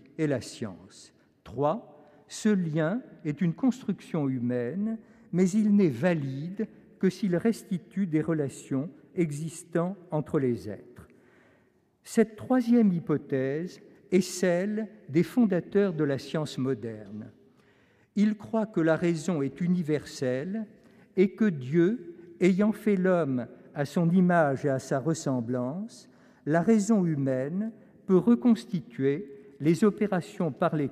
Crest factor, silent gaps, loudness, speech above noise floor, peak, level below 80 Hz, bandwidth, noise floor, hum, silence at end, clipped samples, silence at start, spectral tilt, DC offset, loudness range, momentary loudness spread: 18 dB; none; -28 LUFS; 39 dB; -10 dBFS; -68 dBFS; 14 kHz; -66 dBFS; none; 0 s; under 0.1%; 0.2 s; -7 dB/octave; under 0.1%; 4 LU; 13 LU